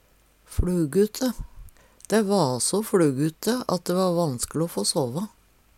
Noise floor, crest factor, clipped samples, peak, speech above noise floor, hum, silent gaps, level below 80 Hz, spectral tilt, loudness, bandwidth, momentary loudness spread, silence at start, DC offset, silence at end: -59 dBFS; 16 dB; under 0.1%; -8 dBFS; 35 dB; none; none; -40 dBFS; -5 dB/octave; -24 LUFS; 17 kHz; 9 LU; 0.5 s; under 0.1%; 0.5 s